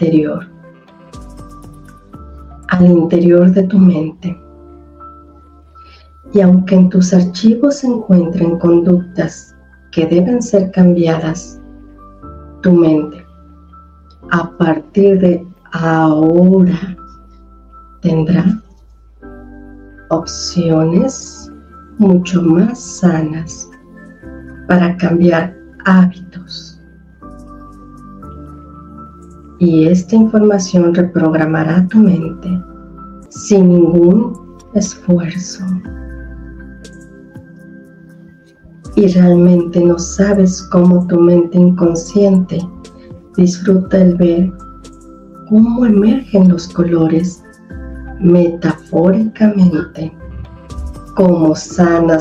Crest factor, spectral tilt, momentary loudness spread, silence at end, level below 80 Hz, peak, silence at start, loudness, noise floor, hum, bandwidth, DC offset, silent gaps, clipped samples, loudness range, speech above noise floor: 12 dB; -7.5 dB/octave; 20 LU; 0 s; -38 dBFS; 0 dBFS; 0 s; -11 LUFS; -42 dBFS; none; 8 kHz; under 0.1%; none; under 0.1%; 7 LU; 32 dB